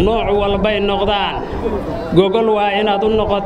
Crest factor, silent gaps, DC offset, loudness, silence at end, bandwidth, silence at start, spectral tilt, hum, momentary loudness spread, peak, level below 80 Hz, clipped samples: 16 dB; none; under 0.1%; -16 LUFS; 0 s; 10 kHz; 0 s; -7 dB/octave; none; 7 LU; 0 dBFS; -30 dBFS; under 0.1%